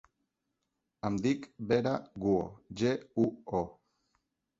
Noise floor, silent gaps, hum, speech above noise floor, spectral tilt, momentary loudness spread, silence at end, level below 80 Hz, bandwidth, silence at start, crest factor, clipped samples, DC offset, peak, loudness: -84 dBFS; none; none; 52 dB; -7 dB/octave; 6 LU; 0.9 s; -62 dBFS; 7.8 kHz; 1.05 s; 20 dB; under 0.1%; under 0.1%; -14 dBFS; -33 LUFS